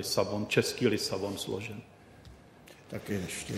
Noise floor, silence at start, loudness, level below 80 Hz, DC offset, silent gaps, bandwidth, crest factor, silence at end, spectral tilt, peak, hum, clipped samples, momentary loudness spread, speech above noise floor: -54 dBFS; 0 s; -32 LUFS; -62 dBFS; under 0.1%; none; 16 kHz; 22 dB; 0 s; -4 dB/octave; -12 dBFS; none; under 0.1%; 14 LU; 22 dB